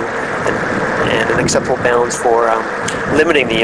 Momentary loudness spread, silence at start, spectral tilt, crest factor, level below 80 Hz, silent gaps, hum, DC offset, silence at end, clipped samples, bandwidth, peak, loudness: 5 LU; 0 s; -4 dB/octave; 14 dB; -40 dBFS; none; none; under 0.1%; 0 s; under 0.1%; 11 kHz; 0 dBFS; -14 LUFS